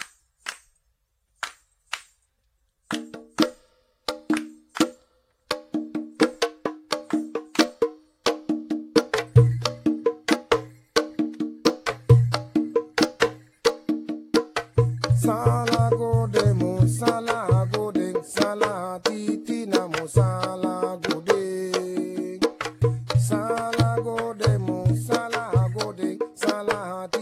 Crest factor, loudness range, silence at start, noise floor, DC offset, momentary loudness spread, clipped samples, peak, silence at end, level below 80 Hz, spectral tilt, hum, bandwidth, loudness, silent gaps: 22 dB; 7 LU; 0 s; -71 dBFS; under 0.1%; 11 LU; under 0.1%; -2 dBFS; 0 s; -48 dBFS; -6 dB/octave; none; 15 kHz; -24 LUFS; none